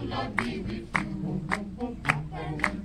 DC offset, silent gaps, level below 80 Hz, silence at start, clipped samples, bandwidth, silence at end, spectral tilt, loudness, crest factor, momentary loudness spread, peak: under 0.1%; none; -44 dBFS; 0 s; under 0.1%; 13.5 kHz; 0 s; -5.5 dB/octave; -31 LUFS; 24 dB; 6 LU; -6 dBFS